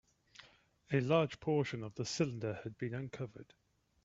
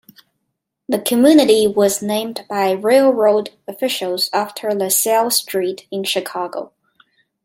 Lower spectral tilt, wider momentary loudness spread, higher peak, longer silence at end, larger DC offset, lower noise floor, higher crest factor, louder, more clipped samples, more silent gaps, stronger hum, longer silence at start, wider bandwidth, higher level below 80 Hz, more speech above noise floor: first, -6 dB/octave vs -3 dB/octave; first, 16 LU vs 12 LU; second, -16 dBFS vs 0 dBFS; second, 0.6 s vs 0.8 s; neither; second, -66 dBFS vs -75 dBFS; first, 22 dB vs 16 dB; second, -37 LUFS vs -16 LUFS; neither; neither; neither; second, 0.4 s vs 0.9 s; second, 8 kHz vs 16.5 kHz; second, -70 dBFS vs -64 dBFS; second, 29 dB vs 59 dB